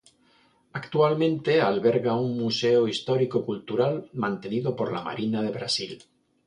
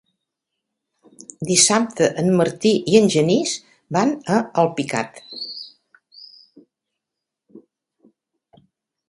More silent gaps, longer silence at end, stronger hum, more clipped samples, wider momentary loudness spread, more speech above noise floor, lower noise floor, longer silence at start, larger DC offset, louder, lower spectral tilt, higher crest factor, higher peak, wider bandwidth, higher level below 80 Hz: neither; second, 0.5 s vs 1.5 s; neither; neither; second, 8 LU vs 16 LU; second, 37 dB vs 65 dB; second, -62 dBFS vs -84 dBFS; second, 0.75 s vs 1.4 s; neither; second, -25 LUFS vs -18 LUFS; first, -6 dB/octave vs -4 dB/octave; about the same, 18 dB vs 22 dB; second, -8 dBFS vs 0 dBFS; about the same, 10.5 kHz vs 11.5 kHz; about the same, -68 dBFS vs -64 dBFS